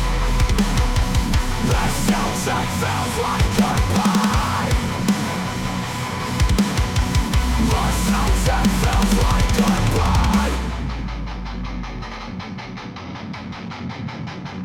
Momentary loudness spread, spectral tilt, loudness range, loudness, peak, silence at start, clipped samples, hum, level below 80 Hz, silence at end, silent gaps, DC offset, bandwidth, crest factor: 13 LU; -5 dB/octave; 10 LU; -20 LUFS; -6 dBFS; 0 s; under 0.1%; none; -24 dBFS; 0 s; none; under 0.1%; 18 kHz; 12 dB